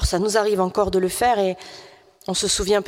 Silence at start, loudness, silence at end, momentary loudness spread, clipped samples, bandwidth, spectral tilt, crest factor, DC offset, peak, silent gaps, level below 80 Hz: 0 s; -21 LUFS; 0 s; 13 LU; under 0.1%; 16.5 kHz; -3.5 dB/octave; 16 dB; under 0.1%; -6 dBFS; none; -34 dBFS